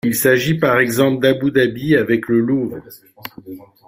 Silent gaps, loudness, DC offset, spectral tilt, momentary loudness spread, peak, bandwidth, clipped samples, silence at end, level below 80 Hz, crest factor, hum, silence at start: none; -16 LUFS; under 0.1%; -5.5 dB/octave; 20 LU; -2 dBFS; 16 kHz; under 0.1%; 0.3 s; -54 dBFS; 16 dB; none; 0.05 s